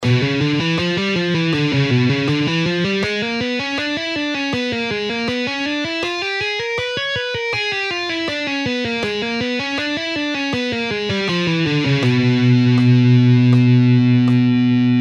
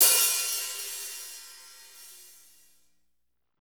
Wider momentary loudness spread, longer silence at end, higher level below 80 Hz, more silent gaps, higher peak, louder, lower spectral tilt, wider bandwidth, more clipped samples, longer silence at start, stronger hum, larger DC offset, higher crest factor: second, 8 LU vs 26 LU; second, 0 s vs 1.4 s; first, -52 dBFS vs -84 dBFS; neither; about the same, -4 dBFS vs -6 dBFS; first, -17 LUFS vs -26 LUFS; first, -6.5 dB/octave vs 4.5 dB/octave; second, 8.8 kHz vs over 20 kHz; neither; about the same, 0 s vs 0 s; second, none vs 60 Hz at -85 dBFS; neither; second, 14 dB vs 24 dB